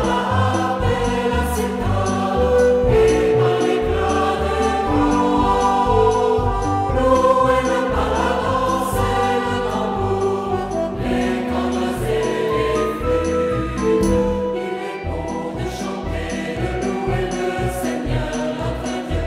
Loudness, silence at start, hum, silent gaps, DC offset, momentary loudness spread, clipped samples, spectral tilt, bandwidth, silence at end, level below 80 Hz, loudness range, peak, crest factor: -19 LUFS; 0 s; none; none; under 0.1%; 9 LU; under 0.1%; -6 dB/octave; 16 kHz; 0 s; -30 dBFS; 6 LU; -4 dBFS; 16 dB